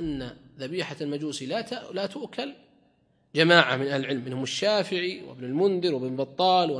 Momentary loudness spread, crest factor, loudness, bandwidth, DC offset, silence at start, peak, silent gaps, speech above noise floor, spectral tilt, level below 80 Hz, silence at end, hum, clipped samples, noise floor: 16 LU; 26 dB; -26 LUFS; 10.5 kHz; under 0.1%; 0 s; 0 dBFS; none; 39 dB; -4.5 dB/octave; -60 dBFS; 0 s; none; under 0.1%; -65 dBFS